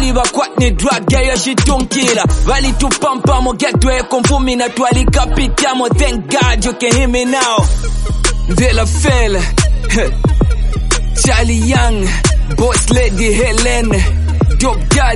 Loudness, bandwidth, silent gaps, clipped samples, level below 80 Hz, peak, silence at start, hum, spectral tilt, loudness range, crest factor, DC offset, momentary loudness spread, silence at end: -13 LUFS; 11.5 kHz; none; under 0.1%; -14 dBFS; 0 dBFS; 0 s; none; -4.5 dB/octave; 1 LU; 12 dB; under 0.1%; 3 LU; 0 s